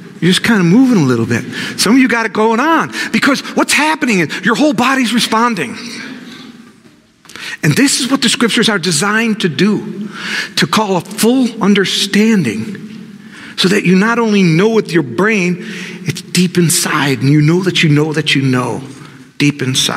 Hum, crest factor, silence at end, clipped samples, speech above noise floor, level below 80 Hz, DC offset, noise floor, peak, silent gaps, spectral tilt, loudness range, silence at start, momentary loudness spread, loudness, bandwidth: none; 12 dB; 0 s; under 0.1%; 33 dB; -58 dBFS; under 0.1%; -45 dBFS; 0 dBFS; none; -4.5 dB/octave; 3 LU; 0 s; 12 LU; -12 LUFS; 16 kHz